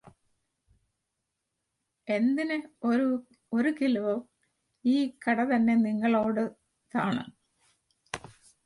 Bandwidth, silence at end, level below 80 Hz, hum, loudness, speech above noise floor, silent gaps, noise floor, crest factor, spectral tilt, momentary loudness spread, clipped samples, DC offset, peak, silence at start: 11 kHz; 0.5 s; -70 dBFS; none; -28 LUFS; 56 dB; none; -83 dBFS; 16 dB; -6.5 dB/octave; 13 LU; under 0.1%; under 0.1%; -14 dBFS; 2.05 s